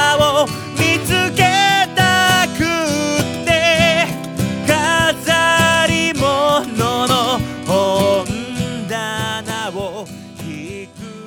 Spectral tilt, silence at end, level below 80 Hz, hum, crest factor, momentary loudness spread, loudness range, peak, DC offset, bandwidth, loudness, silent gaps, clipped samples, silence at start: -3.5 dB/octave; 0 s; -40 dBFS; none; 16 dB; 14 LU; 6 LU; 0 dBFS; under 0.1%; over 20 kHz; -15 LUFS; none; under 0.1%; 0 s